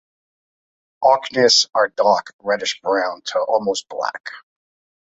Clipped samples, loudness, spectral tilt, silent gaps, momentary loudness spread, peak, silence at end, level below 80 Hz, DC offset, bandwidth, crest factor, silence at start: under 0.1%; -18 LUFS; -1.5 dB/octave; 2.33-2.39 s, 4.20-4.24 s; 12 LU; -2 dBFS; 0.75 s; -68 dBFS; under 0.1%; 8.2 kHz; 18 dB; 1 s